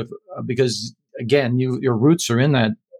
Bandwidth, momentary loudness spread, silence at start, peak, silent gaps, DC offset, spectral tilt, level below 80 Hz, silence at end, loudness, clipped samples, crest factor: 16 kHz; 15 LU; 0 s; -4 dBFS; none; under 0.1%; -5.5 dB/octave; -62 dBFS; 0.25 s; -19 LUFS; under 0.1%; 16 dB